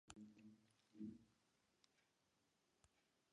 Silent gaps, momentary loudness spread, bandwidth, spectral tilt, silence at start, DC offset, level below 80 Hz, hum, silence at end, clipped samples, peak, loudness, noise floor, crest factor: none; 11 LU; 9.6 kHz; -5 dB/octave; 0.05 s; under 0.1%; -88 dBFS; none; 0.3 s; under 0.1%; -40 dBFS; -61 LUFS; -85 dBFS; 26 dB